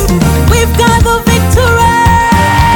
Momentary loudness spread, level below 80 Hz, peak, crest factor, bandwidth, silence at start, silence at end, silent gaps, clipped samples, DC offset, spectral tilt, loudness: 2 LU; -16 dBFS; 0 dBFS; 8 dB; 19.5 kHz; 0 s; 0 s; none; under 0.1%; 0.7%; -5 dB/octave; -8 LUFS